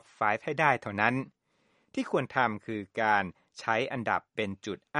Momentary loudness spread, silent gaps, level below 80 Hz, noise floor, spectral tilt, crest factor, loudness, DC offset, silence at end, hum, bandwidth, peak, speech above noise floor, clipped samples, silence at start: 11 LU; none; -70 dBFS; -71 dBFS; -5.5 dB/octave; 24 dB; -30 LUFS; under 0.1%; 0 s; none; 11 kHz; -8 dBFS; 41 dB; under 0.1%; 0.2 s